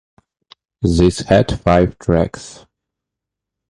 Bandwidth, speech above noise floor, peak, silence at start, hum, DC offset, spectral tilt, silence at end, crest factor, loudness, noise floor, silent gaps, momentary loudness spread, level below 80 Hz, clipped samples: 11 kHz; 68 dB; 0 dBFS; 0.8 s; none; under 0.1%; -6.5 dB/octave; 1.15 s; 18 dB; -16 LUFS; -82 dBFS; none; 10 LU; -32 dBFS; under 0.1%